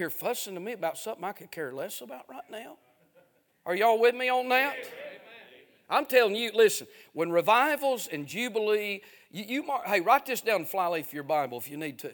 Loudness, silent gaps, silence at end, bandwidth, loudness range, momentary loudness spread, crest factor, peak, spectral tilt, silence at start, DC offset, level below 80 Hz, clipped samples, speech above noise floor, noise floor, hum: -28 LUFS; none; 0 s; 19.5 kHz; 8 LU; 19 LU; 22 dB; -8 dBFS; -3 dB/octave; 0 s; under 0.1%; -84 dBFS; under 0.1%; 36 dB; -64 dBFS; none